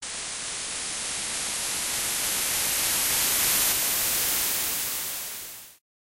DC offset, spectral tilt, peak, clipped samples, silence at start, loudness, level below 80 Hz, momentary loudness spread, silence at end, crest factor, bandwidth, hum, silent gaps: under 0.1%; 0.5 dB/octave; -10 dBFS; under 0.1%; 0 s; -24 LUFS; -54 dBFS; 10 LU; 0.45 s; 18 dB; 16 kHz; none; none